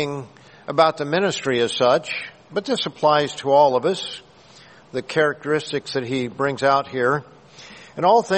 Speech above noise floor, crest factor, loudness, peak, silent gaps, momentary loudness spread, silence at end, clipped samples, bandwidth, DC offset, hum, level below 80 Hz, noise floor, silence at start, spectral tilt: 28 dB; 20 dB; -21 LUFS; -2 dBFS; none; 14 LU; 0 s; under 0.1%; 8.8 kHz; under 0.1%; none; -62 dBFS; -48 dBFS; 0 s; -4.5 dB/octave